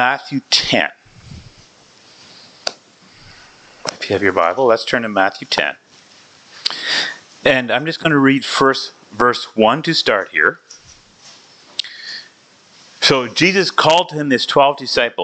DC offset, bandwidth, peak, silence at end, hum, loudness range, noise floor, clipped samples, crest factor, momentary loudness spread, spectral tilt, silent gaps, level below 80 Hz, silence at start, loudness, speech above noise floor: under 0.1%; 9.2 kHz; 0 dBFS; 0 s; none; 6 LU; -48 dBFS; under 0.1%; 18 dB; 13 LU; -3.5 dB/octave; none; -54 dBFS; 0 s; -16 LUFS; 33 dB